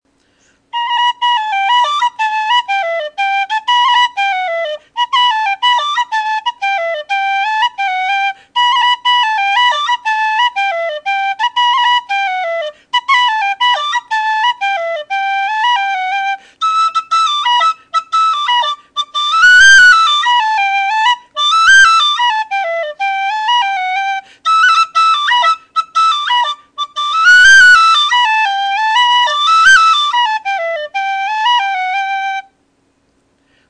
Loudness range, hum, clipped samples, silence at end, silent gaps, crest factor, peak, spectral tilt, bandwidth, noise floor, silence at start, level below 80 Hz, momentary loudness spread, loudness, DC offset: 7 LU; none; under 0.1%; 1.3 s; none; 12 dB; 0 dBFS; 3 dB/octave; 10.5 kHz; -58 dBFS; 0.75 s; -54 dBFS; 12 LU; -11 LUFS; under 0.1%